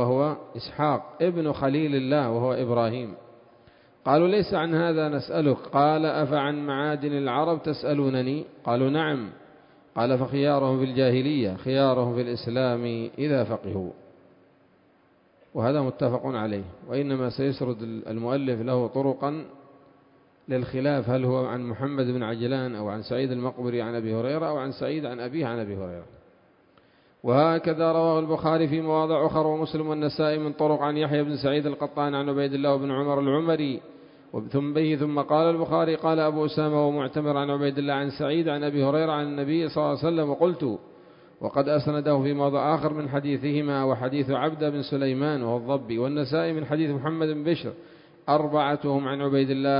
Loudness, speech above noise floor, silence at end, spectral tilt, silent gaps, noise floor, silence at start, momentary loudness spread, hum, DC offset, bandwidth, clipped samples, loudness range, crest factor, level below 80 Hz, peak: -26 LUFS; 36 dB; 0 s; -11.5 dB/octave; none; -61 dBFS; 0 s; 8 LU; none; under 0.1%; 5.4 kHz; under 0.1%; 5 LU; 20 dB; -60 dBFS; -6 dBFS